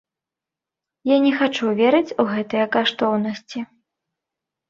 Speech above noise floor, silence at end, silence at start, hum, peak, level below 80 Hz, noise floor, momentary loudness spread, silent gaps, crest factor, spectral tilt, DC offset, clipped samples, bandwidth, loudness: 68 dB; 1.05 s; 1.05 s; none; -2 dBFS; -68 dBFS; -87 dBFS; 14 LU; none; 18 dB; -5.5 dB/octave; under 0.1%; under 0.1%; 7.6 kHz; -20 LUFS